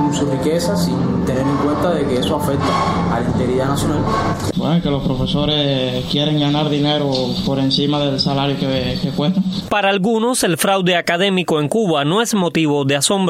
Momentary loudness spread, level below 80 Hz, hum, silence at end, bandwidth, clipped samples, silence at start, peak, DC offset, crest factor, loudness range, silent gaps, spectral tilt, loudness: 3 LU; -38 dBFS; none; 0 s; 16 kHz; under 0.1%; 0 s; 0 dBFS; under 0.1%; 16 dB; 2 LU; none; -5 dB/octave; -17 LUFS